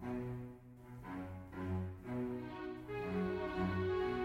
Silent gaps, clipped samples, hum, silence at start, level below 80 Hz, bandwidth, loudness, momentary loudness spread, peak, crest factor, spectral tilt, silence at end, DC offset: none; under 0.1%; none; 0 s; -60 dBFS; 15.5 kHz; -42 LUFS; 12 LU; -26 dBFS; 14 dB; -8.5 dB/octave; 0 s; under 0.1%